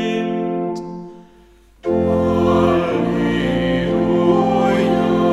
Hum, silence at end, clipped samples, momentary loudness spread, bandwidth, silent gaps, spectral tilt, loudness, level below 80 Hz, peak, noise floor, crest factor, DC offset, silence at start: none; 0 s; under 0.1%; 10 LU; 11 kHz; none; -7.5 dB/octave; -17 LUFS; -40 dBFS; -2 dBFS; -48 dBFS; 16 dB; under 0.1%; 0 s